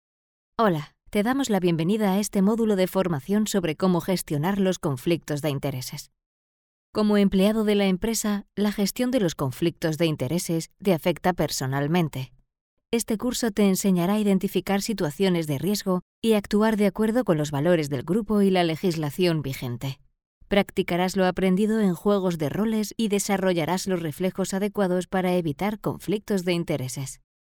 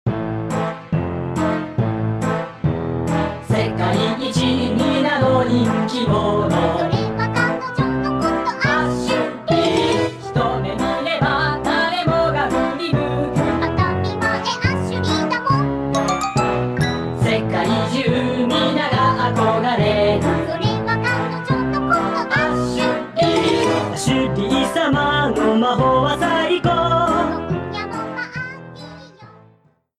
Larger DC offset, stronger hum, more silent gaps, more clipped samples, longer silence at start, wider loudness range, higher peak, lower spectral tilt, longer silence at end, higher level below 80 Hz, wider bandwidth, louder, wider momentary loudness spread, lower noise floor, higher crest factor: neither; neither; first, 6.26-6.93 s, 12.61-12.77 s, 16.02-16.22 s, 20.26-20.41 s vs none; neither; first, 0.6 s vs 0.05 s; about the same, 3 LU vs 3 LU; about the same, -6 dBFS vs -4 dBFS; about the same, -5.5 dB/octave vs -6 dB/octave; second, 0.45 s vs 0.7 s; second, -52 dBFS vs -40 dBFS; first, 19.5 kHz vs 13 kHz; second, -24 LUFS vs -19 LUFS; about the same, 7 LU vs 6 LU; first, under -90 dBFS vs -55 dBFS; about the same, 18 dB vs 14 dB